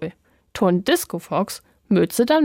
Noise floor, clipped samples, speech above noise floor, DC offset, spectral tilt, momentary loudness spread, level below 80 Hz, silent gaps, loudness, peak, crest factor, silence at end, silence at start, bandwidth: -39 dBFS; under 0.1%; 20 dB; under 0.1%; -5 dB/octave; 16 LU; -58 dBFS; none; -21 LUFS; -6 dBFS; 16 dB; 0 s; 0 s; 16.5 kHz